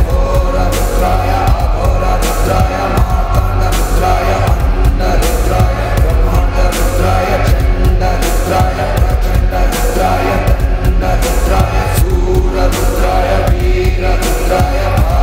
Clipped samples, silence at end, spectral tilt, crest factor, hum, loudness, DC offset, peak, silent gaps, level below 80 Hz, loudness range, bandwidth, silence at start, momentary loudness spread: under 0.1%; 0 s; -5.5 dB/octave; 10 dB; none; -13 LUFS; 0.4%; 0 dBFS; none; -12 dBFS; 0 LU; 16.5 kHz; 0 s; 2 LU